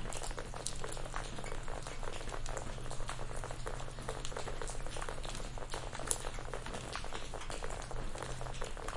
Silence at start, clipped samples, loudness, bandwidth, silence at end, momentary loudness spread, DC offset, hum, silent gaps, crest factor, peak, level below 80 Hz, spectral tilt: 0 s; under 0.1%; -43 LUFS; 11.5 kHz; 0 s; 3 LU; under 0.1%; none; none; 30 dB; -8 dBFS; -44 dBFS; -3 dB/octave